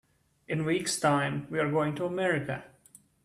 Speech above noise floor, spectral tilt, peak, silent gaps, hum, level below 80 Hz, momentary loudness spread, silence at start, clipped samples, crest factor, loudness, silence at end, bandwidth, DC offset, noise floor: 30 dB; -5 dB/octave; -14 dBFS; none; none; -66 dBFS; 8 LU; 0.5 s; under 0.1%; 16 dB; -29 LUFS; 0.6 s; 14.5 kHz; under 0.1%; -59 dBFS